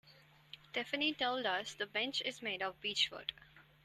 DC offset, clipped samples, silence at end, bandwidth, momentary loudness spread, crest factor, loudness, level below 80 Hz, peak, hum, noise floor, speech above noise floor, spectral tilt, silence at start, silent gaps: under 0.1%; under 0.1%; 0.2 s; 13.5 kHz; 10 LU; 20 dB; -37 LUFS; -76 dBFS; -20 dBFS; none; -64 dBFS; 25 dB; -2 dB/octave; 0.05 s; none